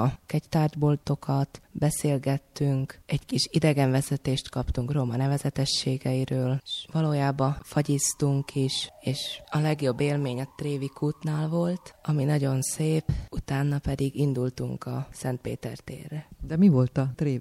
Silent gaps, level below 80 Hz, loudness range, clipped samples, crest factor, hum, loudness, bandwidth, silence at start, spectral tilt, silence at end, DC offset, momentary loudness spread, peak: none; -46 dBFS; 2 LU; under 0.1%; 18 dB; none; -27 LUFS; 14.5 kHz; 0 s; -6 dB/octave; 0 s; under 0.1%; 8 LU; -8 dBFS